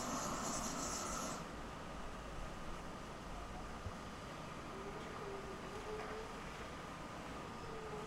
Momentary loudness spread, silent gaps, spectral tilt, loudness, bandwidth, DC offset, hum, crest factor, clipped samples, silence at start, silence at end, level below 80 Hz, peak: 8 LU; none; -3.5 dB/octave; -46 LUFS; 16 kHz; under 0.1%; none; 18 dB; under 0.1%; 0 s; 0 s; -56 dBFS; -28 dBFS